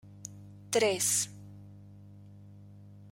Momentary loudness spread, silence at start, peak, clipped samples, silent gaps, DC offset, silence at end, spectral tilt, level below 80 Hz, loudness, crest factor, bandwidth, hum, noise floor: 26 LU; 0.05 s; -12 dBFS; under 0.1%; none; under 0.1%; 0 s; -2 dB/octave; -70 dBFS; -29 LUFS; 24 dB; 16.5 kHz; 50 Hz at -50 dBFS; -52 dBFS